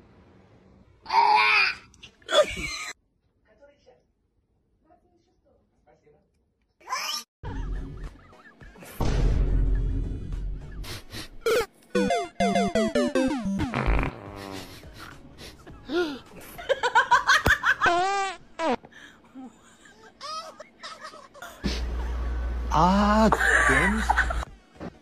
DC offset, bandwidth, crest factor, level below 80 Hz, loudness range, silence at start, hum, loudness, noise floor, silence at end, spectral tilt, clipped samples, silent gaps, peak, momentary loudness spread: under 0.1%; 15 kHz; 20 dB; -34 dBFS; 13 LU; 1.05 s; none; -24 LUFS; -70 dBFS; 0.1 s; -4.5 dB/octave; under 0.1%; 7.28-7.43 s; -8 dBFS; 24 LU